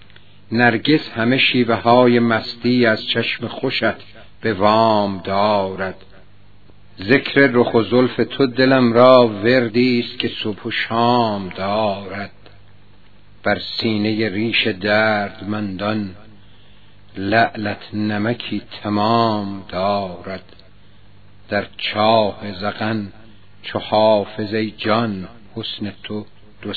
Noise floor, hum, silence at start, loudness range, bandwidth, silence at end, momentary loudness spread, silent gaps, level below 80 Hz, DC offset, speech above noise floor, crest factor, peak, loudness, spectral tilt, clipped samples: -50 dBFS; none; 0.5 s; 7 LU; 5.4 kHz; 0 s; 14 LU; none; -54 dBFS; 0.9%; 33 dB; 18 dB; 0 dBFS; -18 LUFS; -8 dB/octave; under 0.1%